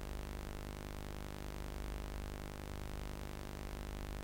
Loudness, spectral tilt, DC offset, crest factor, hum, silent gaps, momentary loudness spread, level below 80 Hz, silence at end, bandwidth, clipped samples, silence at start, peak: -47 LUFS; -5 dB/octave; under 0.1%; 16 dB; none; none; 1 LU; -46 dBFS; 0 s; 16.5 kHz; under 0.1%; 0 s; -28 dBFS